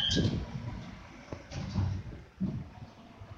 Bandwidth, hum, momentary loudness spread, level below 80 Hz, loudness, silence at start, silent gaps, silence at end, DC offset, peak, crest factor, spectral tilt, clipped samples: 7.8 kHz; none; 18 LU; -48 dBFS; -36 LUFS; 0 s; none; 0 s; under 0.1%; -18 dBFS; 18 dB; -5 dB/octave; under 0.1%